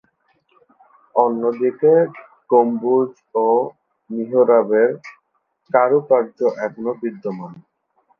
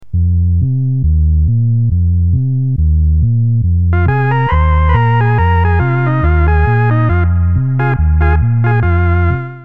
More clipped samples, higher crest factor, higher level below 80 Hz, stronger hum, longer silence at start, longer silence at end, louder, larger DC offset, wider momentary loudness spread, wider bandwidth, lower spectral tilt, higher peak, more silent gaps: neither; first, 18 dB vs 10 dB; second, -74 dBFS vs -18 dBFS; neither; first, 1.15 s vs 0 s; first, 0.6 s vs 0 s; second, -18 LUFS vs -12 LUFS; second, under 0.1% vs 3%; first, 14 LU vs 2 LU; first, 5.8 kHz vs 3.7 kHz; about the same, -9.5 dB/octave vs -10.5 dB/octave; about the same, 0 dBFS vs 0 dBFS; neither